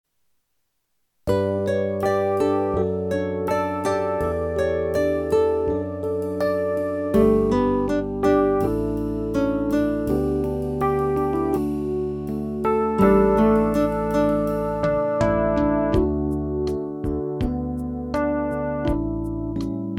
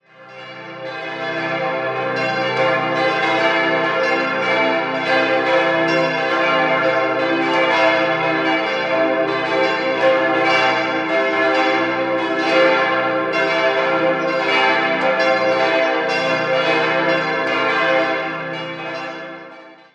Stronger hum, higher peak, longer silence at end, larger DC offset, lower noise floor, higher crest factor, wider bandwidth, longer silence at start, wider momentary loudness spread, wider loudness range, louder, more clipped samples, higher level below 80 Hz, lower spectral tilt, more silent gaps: neither; second, -6 dBFS vs -2 dBFS; second, 0 s vs 0.2 s; neither; first, -73 dBFS vs -40 dBFS; about the same, 16 dB vs 16 dB; first, 16.5 kHz vs 9.2 kHz; first, 1.25 s vs 0.2 s; about the same, 8 LU vs 10 LU; about the same, 4 LU vs 2 LU; second, -22 LUFS vs -17 LUFS; neither; first, -36 dBFS vs -64 dBFS; first, -8 dB/octave vs -4.5 dB/octave; neither